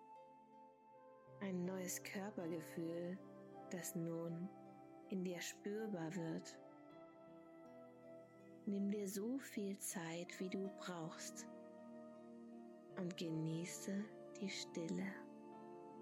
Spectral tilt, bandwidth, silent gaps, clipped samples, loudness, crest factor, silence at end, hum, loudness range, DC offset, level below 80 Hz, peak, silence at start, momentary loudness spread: -5 dB/octave; 16 kHz; none; under 0.1%; -48 LUFS; 16 dB; 0 s; none; 3 LU; under 0.1%; under -90 dBFS; -34 dBFS; 0 s; 16 LU